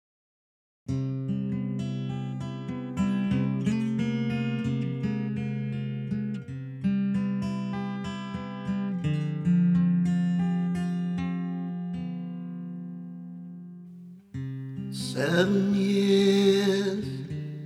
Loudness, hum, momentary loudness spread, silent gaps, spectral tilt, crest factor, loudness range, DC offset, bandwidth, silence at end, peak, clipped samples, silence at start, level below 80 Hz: -28 LUFS; 50 Hz at -55 dBFS; 15 LU; none; -7 dB/octave; 18 dB; 9 LU; under 0.1%; 12.5 kHz; 0 s; -10 dBFS; under 0.1%; 0.9 s; -58 dBFS